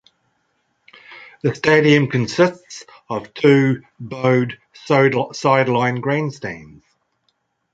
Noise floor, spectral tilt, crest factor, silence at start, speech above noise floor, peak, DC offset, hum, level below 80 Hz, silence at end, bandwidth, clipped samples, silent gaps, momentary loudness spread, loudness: -68 dBFS; -6.5 dB/octave; 18 dB; 1.1 s; 51 dB; -2 dBFS; under 0.1%; none; -58 dBFS; 1.1 s; 7.8 kHz; under 0.1%; none; 20 LU; -17 LUFS